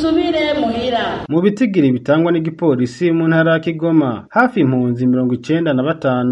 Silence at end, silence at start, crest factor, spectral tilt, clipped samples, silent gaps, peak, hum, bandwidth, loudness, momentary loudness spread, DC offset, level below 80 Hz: 0 s; 0 s; 14 dB; -7.5 dB/octave; under 0.1%; none; 0 dBFS; none; 8.4 kHz; -16 LUFS; 4 LU; under 0.1%; -48 dBFS